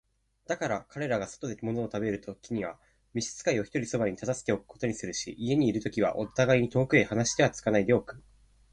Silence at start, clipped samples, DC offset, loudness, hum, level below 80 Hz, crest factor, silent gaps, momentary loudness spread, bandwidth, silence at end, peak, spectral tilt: 0.5 s; under 0.1%; under 0.1%; -29 LUFS; none; -58 dBFS; 20 dB; none; 11 LU; 11 kHz; 0.55 s; -10 dBFS; -5 dB/octave